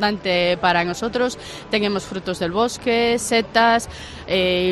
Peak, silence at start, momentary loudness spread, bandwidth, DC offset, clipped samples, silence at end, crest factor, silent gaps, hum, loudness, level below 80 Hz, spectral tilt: -2 dBFS; 0 s; 9 LU; 13 kHz; under 0.1%; under 0.1%; 0 s; 18 dB; none; none; -20 LUFS; -46 dBFS; -4 dB/octave